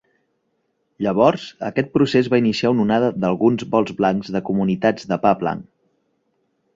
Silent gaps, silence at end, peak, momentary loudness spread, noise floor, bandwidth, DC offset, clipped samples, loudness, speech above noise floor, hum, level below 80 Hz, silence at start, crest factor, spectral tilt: none; 1.15 s; -2 dBFS; 7 LU; -70 dBFS; 7.8 kHz; under 0.1%; under 0.1%; -19 LUFS; 51 dB; none; -56 dBFS; 1 s; 18 dB; -7 dB/octave